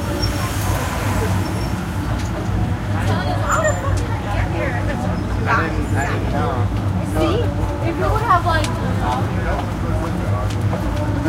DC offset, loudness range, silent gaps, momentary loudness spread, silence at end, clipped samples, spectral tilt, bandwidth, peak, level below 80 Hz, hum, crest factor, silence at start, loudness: under 0.1%; 2 LU; none; 4 LU; 0 s; under 0.1%; -6 dB/octave; 16 kHz; -2 dBFS; -28 dBFS; none; 16 dB; 0 s; -20 LUFS